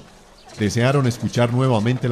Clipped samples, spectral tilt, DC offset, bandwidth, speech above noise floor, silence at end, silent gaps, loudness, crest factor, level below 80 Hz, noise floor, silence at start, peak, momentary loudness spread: under 0.1%; -6.5 dB/octave; under 0.1%; 13.5 kHz; 27 dB; 0 s; none; -19 LUFS; 14 dB; -46 dBFS; -46 dBFS; 0.45 s; -6 dBFS; 5 LU